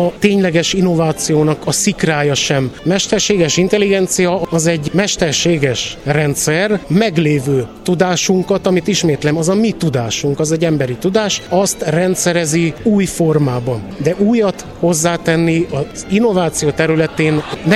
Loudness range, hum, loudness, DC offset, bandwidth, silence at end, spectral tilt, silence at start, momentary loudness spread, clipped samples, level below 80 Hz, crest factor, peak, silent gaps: 1 LU; none; -14 LUFS; under 0.1%; 14.5 kHz; 0 s; -4.5 dB/octave; 0 s; 4 LU; under 0.1%; -42 dBFS; 14 dB; 0 dBFS; none